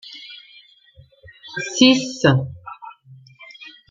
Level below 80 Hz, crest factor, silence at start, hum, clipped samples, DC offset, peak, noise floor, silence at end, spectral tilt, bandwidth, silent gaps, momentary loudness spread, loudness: -60 dBFS; 22 dB; 0.05 s; none; under 0.1%; under 0.1%; 0 dBFS; -51 dBFS; 0.2 s; -4.5 dB/octave; 7.6 kHz; none; 26 LU; -17 LUFS